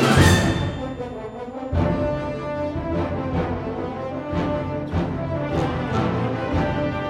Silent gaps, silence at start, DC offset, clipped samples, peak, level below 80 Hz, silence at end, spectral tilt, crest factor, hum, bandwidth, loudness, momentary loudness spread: none; 0 s; under 0.1%; under 0.1%; -4 dBFS; -36 dBFS; 0 s; -6 dB/octave; 20 dB; none; 16.5 kHz; -24 LUFS; 9 LU